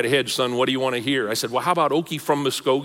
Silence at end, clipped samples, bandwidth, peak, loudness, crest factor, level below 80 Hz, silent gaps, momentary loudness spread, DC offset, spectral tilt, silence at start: 0 s; under 0.1%; 17 kHz; -6 dBFS; -22 LUFS; 16 dB; -66 dBFS; none; 3 LU; under 0.1%; -4 dB/octave; 0 s